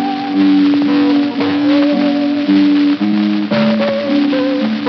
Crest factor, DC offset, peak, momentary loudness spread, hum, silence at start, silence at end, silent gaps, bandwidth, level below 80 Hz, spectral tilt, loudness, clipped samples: 12 dB; under 0.1%; 0 dBFS; 4 LU; none; 0 s; 0 s; none; 6 kHz; -70 dBFS; -4.5 dB/octave; -13 LUFS; under 0.1%